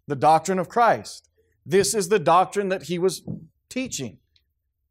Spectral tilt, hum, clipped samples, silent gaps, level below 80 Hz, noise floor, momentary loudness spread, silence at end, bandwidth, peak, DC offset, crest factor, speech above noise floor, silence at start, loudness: -4 dB/octave; none; under 0.1%; none; -62 dBFS; -74 dBFS; 18 LU; 0.8 s; 16 kHz; -6 dBFS; under 0.1%; 16 dB; 53 dB; 0.1 s; -22 LUFS